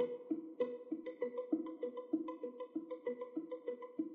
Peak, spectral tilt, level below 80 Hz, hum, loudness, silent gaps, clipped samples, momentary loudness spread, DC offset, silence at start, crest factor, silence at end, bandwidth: -24 dBFS; -5.5 dB/octave; under -90 dBFS; none; -43 LUFS; none; under 0.1%; 6 LU; under 0.1%; 0 s; 18 dB; 0 s; 3.9 kHz